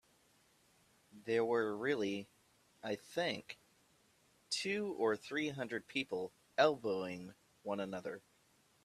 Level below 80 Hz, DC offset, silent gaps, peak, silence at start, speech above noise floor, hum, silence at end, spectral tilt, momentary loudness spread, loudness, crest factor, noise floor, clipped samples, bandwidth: -82 dBFS; under 0.1%; none; -16 dBFS; 1.15 s; 34 dB; none; 0.65 s; -4 dB/octave; 17 LU; -38 LUFS; 24 dB; -72 dBFS; under 0.1%; 14 kHz